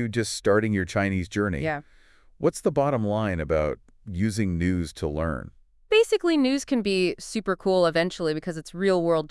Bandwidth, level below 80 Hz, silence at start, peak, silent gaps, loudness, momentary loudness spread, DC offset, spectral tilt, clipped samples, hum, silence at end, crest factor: 12 kHz; -48 dBFS; 0 s; -8 dBFS; none; -25 LUFS; 8 LU; under 0.1%; -5.5 dB/octave; under 0.1%; none; 0.05 s; 16 dB